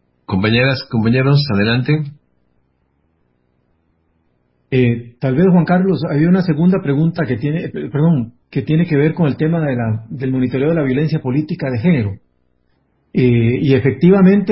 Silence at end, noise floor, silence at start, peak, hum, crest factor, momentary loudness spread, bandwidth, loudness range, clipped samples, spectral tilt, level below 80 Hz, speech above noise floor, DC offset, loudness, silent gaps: 0 s; -62 dBFS; 0.3 s; 0 dBFS; none; 16 dB; 8 LU; 5.8 kHz; 6 LU; under 0.1%; -12.5 dB/octave; -44 dBFS; 48 dB; under 0.1%; -15 LUFS; none